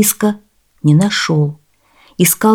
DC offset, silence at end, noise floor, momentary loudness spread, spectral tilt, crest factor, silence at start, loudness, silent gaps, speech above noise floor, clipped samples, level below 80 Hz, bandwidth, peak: under 0.1%; 0 s; -51 dBFS; 11 LU; -4.5 dB/octave; 14 dB; 0 s; -14 LUFS; none; 39 dB; under 0.1%; -56 dBFS; 18.5 kHz; 0 dBFS